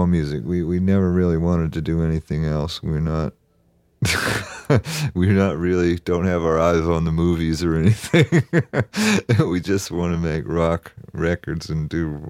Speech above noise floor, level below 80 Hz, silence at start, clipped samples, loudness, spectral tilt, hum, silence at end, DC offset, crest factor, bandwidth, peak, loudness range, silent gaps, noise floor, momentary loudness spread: 41 dB; -36 dBFS; 0 s; under 0.1%; -21 LUFS; -6.5 dB/octave; none; 0 s; under 0.1%; 18 dB; 15.5 kHz; -2 dBFS; 4 LU; none; -60 dBFS; 7 LU